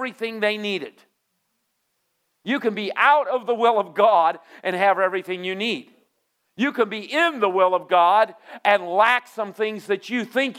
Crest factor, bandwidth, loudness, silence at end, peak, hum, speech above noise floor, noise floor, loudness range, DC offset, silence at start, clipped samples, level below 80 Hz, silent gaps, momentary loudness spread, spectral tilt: 18 dB; 15.5 kHz; -21 LUFS; 0 s; -4 dBFS; none; 52 dB; -73 dBFS; 4 LU; under 0.1%; 0 s; under 0.1%; -86 dBFS; none; 11 LU; -4.5 dB/octave